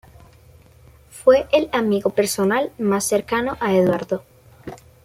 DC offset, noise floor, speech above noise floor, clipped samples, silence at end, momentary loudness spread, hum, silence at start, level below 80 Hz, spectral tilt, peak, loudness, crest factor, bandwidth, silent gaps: under 0.1%; -49 dBFS; 30 dB; under 0.1%; 0.3 s; 16 LU; none; 1.15 s; -52 dBFS; -4.5 dB/octave; -2 dBFS; -19 LUFS; 18 dB; 16 kHz; none